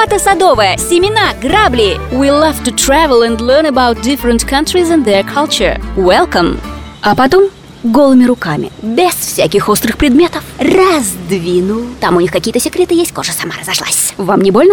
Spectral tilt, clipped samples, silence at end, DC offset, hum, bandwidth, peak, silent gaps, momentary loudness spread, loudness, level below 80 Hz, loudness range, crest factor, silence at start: -4 dB/octave; under 0.1%; 0 s; under 0.1%; none; over 20 kHz; 0 dBFS; none; 7 LU; -10 LUFS; -28 dBFS; 2 LU; 10 dB; 0 s